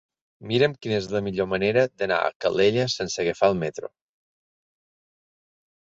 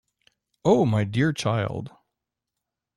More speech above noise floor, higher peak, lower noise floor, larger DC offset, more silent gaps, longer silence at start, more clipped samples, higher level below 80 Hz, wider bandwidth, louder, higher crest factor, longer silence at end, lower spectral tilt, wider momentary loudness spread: first, over 67 dB vs 62 dB; about the same, -6 dBFS vs -8 dBFS; first, under -90 dBFS vs -85 dBFS; neither; first, 2.36-2.40 s vs none; second, 0.4 s vs 0.65 s; neither; about the same, -58 dBFS vs -58 dBFS; second, 8 kHz vs 12 kHz; about the same, -24 LUFS vs -23 LUFS; about the same, 20 dB vs 18 dB; first, 2.05 s vs 1.1 s; second, -5 dB/octave vs -6.5 dB/octave; second, 7 LU vs 13 LU